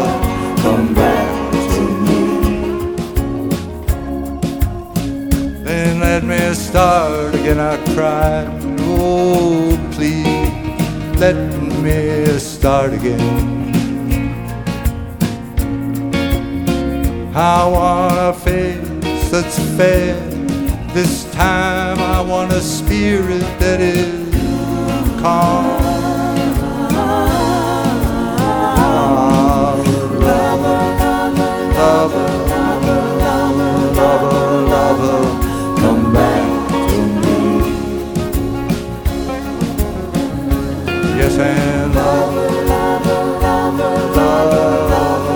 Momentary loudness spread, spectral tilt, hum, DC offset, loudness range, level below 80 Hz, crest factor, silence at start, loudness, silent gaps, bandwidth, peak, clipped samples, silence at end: 7 LU; -6 dB/octave; none; under 0.1%; 5 LU; -24 dBFS; 14 dB; 0 s; -15 LUFS; none; over 20 kHz; 0 dBFS; under 0.1%; 0 s